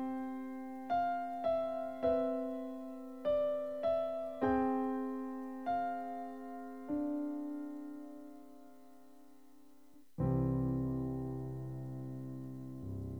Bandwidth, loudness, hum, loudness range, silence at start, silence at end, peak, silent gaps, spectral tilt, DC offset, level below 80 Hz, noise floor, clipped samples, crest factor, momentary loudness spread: 18 kHz; -38 LUFS; none; 8 LU; 0 s; 0 s; -22 dBFS; none; -9 dB/octave; 0.1%; -58 dBFS; -64 dBFS; under 0.1%; 16 dB; 13 LU